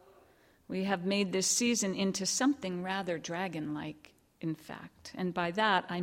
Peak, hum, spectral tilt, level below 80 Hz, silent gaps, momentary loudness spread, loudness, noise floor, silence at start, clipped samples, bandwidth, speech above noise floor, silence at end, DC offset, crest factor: -14 dBFS; none; -3.5 dB/octave; -72 dBFS; none; 13 LU; -32 LUFS; -64 dBFS; 0.7 s; under 0.1%; 16.5 kHz; 31 dB; 0 s; under 0.1%; 20 dB